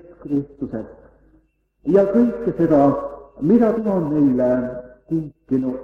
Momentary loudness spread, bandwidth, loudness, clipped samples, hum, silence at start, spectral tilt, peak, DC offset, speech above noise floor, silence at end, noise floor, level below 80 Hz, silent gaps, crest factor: 14 LU; 5.4 kHz; -19 LUFS; under 0.1%; none; 0.1 s; -10.5 dB/octave; -4 dBFS; under 0.1%; 41 dB; 0 s; -59 dBFS; -50 dBFS; none; 16 dB